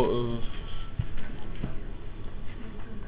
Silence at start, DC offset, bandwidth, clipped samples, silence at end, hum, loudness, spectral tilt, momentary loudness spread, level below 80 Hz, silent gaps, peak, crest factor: 0 s; 0.6%; 4 kHz; under 0.1%; 0 s; none; -37 LUFS; -10.5 dB/octave; 12 LU; -38 dBFS; none; -12 dBFS; 16 dB